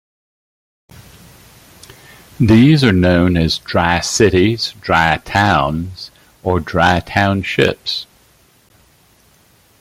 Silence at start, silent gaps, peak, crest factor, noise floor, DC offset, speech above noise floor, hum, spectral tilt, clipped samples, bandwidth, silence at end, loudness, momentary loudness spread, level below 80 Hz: 2.4 s; none; 0 dBFS; 16 dB; -52 dBFS; under 0.1%; 38 dB; none; -5.5 dB/octave; under 0.1%; 16 kHz; 1.75 s; -14 LUFS; 12 LU; -40 dBFS